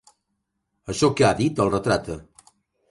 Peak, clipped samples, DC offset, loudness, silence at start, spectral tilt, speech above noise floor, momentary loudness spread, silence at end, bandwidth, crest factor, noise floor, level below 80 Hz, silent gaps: -6 dBFS; under 0.1%; under 0.1%; -22 LUFS; 0.9 s; -5.5 dB/octave; 56 dB; 18 LU; 0.7 s; 11.5 kHz; 18 dB; -77 dBFS; -48 dBFS; none